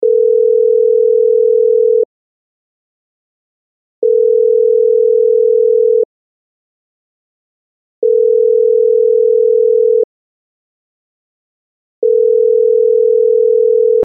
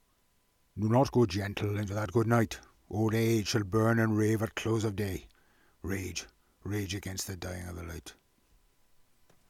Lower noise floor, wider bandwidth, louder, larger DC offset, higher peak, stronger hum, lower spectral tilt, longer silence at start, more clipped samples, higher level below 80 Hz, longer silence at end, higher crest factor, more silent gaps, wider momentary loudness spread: first, under -90 dBFS vs -70 dBFS; second, 0.7 kHz vs 16 kHz; first, -11 LUFS vs -31 LUFS; neither; first, -4 dBFS vs -14 dBFS; neither; second, 0.5 dB/octave vs -6 dB/octave; second, 0 s vs 0.75 s; neither; second, -82 dBFS vs -56 dBFS; second, 0 s vs 1.35 s; second, 8 dB vs 18 dB; first, 2.05-4.02 s, 6.05-8.02 s, 10.04-12.02 s vs none; second, 4 LU vs 16 LU